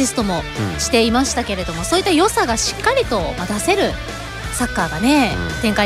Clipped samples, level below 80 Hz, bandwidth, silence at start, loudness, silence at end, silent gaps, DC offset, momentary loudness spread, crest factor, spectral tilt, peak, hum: under 0.1%; -32 dBFS; 16 kHz; 0 s; -18 LUFS; 0 s; none; under 0.1%; 8 LU; 14 dB; -3.5 dB/octave; -4 dBFS; none